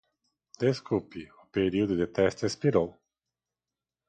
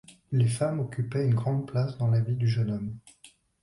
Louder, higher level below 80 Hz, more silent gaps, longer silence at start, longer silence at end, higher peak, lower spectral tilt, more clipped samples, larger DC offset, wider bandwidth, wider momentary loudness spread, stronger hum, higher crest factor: about the same, -29 LUFS vs -28 LUFS; about the same, -56 dBFS vs -58 dBFS; neither; first, 0.6 s vs 0.1 s; first, 1.2 s vs 0.35 s; first, -10 dBFS vs -14 dBFS; about the same, -6.5 dB/octave vs -7.5 dB/octave; neither; neither; second, 9.2 kHz vs 11.5 kHz; first, 9 LU vs 6 LU; neither; first, 20 dB vs 14 dB